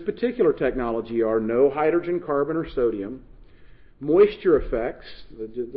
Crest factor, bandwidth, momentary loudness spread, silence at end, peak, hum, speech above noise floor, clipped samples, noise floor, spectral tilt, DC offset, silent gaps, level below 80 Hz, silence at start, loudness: 16 dB; 5.2 kHz; 17 LU; 0 s; -8 dBFS; none; 24 dB; under 0.1%; -47 dBFS; -11 dB/octave; under 0.1%; none; -44 dBFS; 0 s; -23 LUFS